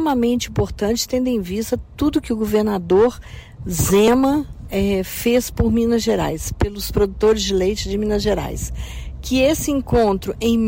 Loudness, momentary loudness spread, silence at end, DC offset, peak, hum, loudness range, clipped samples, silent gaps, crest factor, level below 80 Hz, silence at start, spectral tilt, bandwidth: -19 LUFS; 9 LU; 0 s; under 0.1%; -6 dBFS; none; 2 LU; under 0.1%; none; 14 dB; -32 dBFS; 0 s; -5 dB/octave; 16.5 kHz